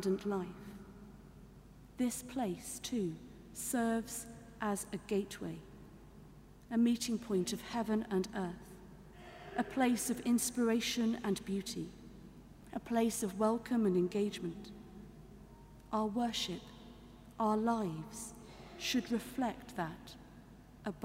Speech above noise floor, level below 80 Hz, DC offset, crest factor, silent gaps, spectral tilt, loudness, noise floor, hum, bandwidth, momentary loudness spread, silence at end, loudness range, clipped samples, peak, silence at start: 21 dB; -62 dBFS; under 0.1%; 18 dB; none; -4.5 dB/octave; -37 LUFS; -57 dBFS; none; 16 kHz; 23 LU; 0 s; 5 LU; under 0.1%; -20 dBFS; 0 s